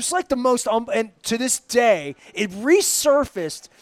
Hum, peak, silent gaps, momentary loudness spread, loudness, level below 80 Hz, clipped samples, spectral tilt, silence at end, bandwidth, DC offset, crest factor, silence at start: none; -4 dBFS; none; 10 LU; -20 LUFS; -54 dBFS; under 0.1%; -2.5 dB/octave; 0.15 s; 16.5 kHz; under 0.1%; 16 dB; 0 s